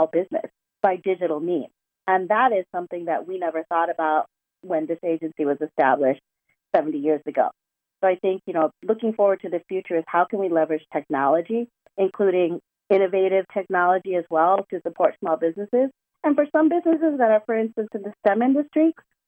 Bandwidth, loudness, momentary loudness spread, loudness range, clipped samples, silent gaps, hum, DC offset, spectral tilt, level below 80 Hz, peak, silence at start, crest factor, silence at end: 4.1 kHz; -23 LUFS; 8 LU; 3 LU; under 0.1%; none; none; under 0.1%; -8.5 dB/octave; -80 dBFS; -4 dBFS; 0 s; 18 dB; 0.35 s